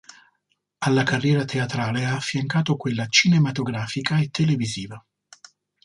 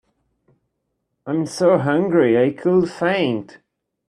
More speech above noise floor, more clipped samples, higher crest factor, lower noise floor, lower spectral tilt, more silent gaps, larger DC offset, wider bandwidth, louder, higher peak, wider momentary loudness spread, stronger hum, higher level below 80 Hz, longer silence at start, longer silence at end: second, 51 dB vs 57 dB; neither; about the same, 20 dB vs 18 dB; about the same, -73 dBFS vs -74 dBFS; second, -5 dB/octave vs -6.5 dB/octave; neither; neither; about the same, 11 kHz vs 11 kHz; second, -22 LUFS vs -18 LUFS; about the same, -4 dBFS vs -2 dBFS; about the same, 9 LU vs 9 LU; first, 50 Hz at -45 dBFS vs none; about the same, -60 dBFS vs -62 dBFS; second, 0.8 s vs 1.25 s; first, 0.85 s vs 0.65 s